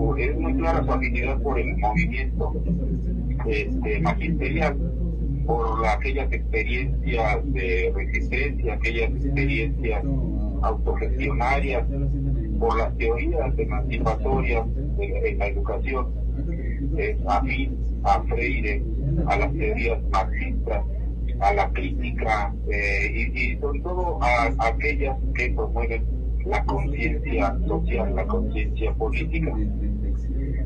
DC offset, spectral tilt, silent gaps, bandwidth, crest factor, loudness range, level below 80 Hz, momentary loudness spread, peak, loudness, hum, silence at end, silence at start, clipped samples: under 0.1%; -8 dB/octave; none; 6.8 kHz; 16 dB; 1 LU; -26 dBFS; 5 LU; -8 dBFS; -25 LUFS; none; 0 s; 0 s; under 0.1%